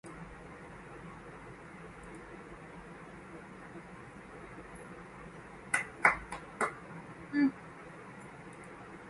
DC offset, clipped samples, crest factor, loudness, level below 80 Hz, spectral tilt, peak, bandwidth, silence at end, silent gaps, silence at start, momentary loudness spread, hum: under 0.1%; under 0.1%; 32 dB; -35 LUFS; -62 dBFS; -4.5 dB/octave; -8 dBFS; 11.5 kHz; 0 s; none; 0.05 s; 18 LU; none